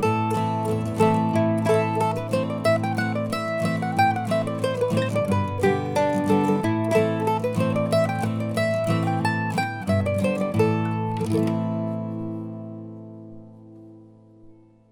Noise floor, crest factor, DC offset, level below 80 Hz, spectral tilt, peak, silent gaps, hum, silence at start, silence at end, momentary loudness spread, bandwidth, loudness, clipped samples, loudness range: -50 dBFS; 18 dB; under 0.1%; -58 dBFS; -7 dB/octave; -6 dBFS; none; none; 0 s; 0.4 s; 8 LU; 17.5 kHz; -23 LUFS; under 0.1%; 6 LU